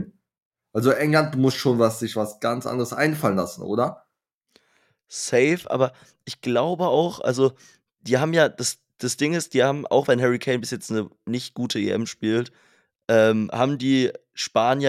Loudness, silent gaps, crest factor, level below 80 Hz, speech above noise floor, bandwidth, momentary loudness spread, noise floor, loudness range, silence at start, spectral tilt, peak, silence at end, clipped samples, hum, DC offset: -23 LUFS; 0.42-0.51 s, 4.34-4.41 s; 18 dB; -70 dBFS; 54 dB; 16 kHz; 10 LU; -76 dBFS; 3 LU; 0 s; -5 dB/octave; -4 dBFS; 0 s; under 0.1%; none; under 0.1%